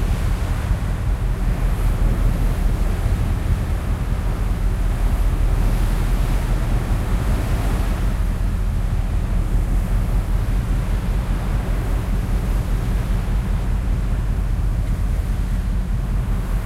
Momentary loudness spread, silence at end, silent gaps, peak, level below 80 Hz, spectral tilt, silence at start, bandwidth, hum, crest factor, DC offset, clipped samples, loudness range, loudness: 2 LU; 0 s; none; -6 dBFS; -20 dBFS; -7 dB/octave; 0 s; 14 kHz; none; 12 dB; under 0.1%; under 0.1%; 1 LU; -23 LUFS